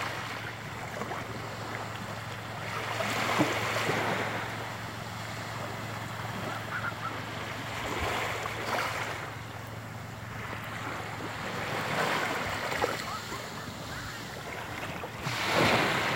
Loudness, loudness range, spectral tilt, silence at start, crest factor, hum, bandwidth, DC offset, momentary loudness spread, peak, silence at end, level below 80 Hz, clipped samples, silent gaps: -33 LUFS; 4 LU; -4 dB/octave; 0 s; 22 dB; none; 16 kHz; under 0.1%; 10 LU; -10 dBFS; 0 s; -56 dBFS; under 0.1%; none